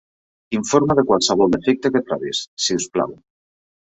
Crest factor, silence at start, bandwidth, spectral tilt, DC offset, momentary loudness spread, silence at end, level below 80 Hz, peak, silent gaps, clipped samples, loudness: 18 dB; 0.5 s; 8.2 kHz; -4 dB/octave; under 0.1%; 9 LU; 0.8 s; -52 dBFS; -2 dBFS; 2.47-2.57 s; under 0.1%; -19 LUFS